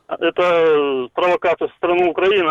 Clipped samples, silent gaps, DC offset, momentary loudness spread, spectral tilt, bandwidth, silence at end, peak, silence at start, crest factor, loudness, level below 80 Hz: under 0.1%; none; under 0.1%; 6 LU; -5.5 dB/octave; 7.6 kHz; 0 s; -8 dBFS; 0.1 s; 10 dB; -17 LUFS; -56 dBFS